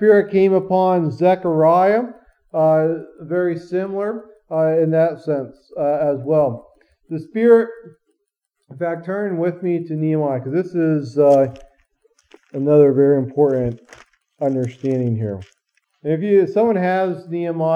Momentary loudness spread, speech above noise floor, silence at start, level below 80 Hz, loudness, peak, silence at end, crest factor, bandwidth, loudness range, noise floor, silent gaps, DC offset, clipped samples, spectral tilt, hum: 13 LU; 57 dB; 0 s; -58 dBFS; -18 LUFS; -2 dBFS; 0 s; 16 dB; 7.2 kHz; 4 LU; -74 dBFS; none; under 0.1%; under 0.1%; -9.5 dB/octave; none